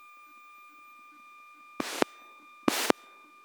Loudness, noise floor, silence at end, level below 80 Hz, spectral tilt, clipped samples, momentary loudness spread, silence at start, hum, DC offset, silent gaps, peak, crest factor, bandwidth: -31 LUFS; -55 dBFS; 0.55 s; -74 dBFS; -2.5 dB/octave; under 0.1%; 23 LU; 1.8 s; none; under 0.1%; none; 0 dBFS; 36 dB; over 20 kHz